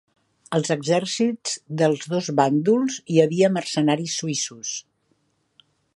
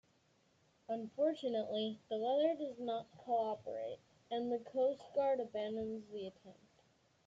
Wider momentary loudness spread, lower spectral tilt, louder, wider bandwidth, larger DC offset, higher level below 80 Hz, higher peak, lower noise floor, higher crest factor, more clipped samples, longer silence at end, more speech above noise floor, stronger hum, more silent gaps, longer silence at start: about the same, 9 LU vs 10 LU; second, -4.5 dB/octave vs -6.5 dB/octave; first, -22 LUFS vs -39 LUFS; first, 11.5 kHz vs 7.8 kHz; neither; first, -72 dBFS vs -82 dBFS; first, -4 dBFS vs -22 dBFS; second, -68 dBFS vs -74 dBFS; about the same, 20 dB vs 18 dB; neither; first, 1.15 s vs 0.75 s; first, 46 dB vs 35 dB; neither; neither; second, 0.5 s vs 0.9 s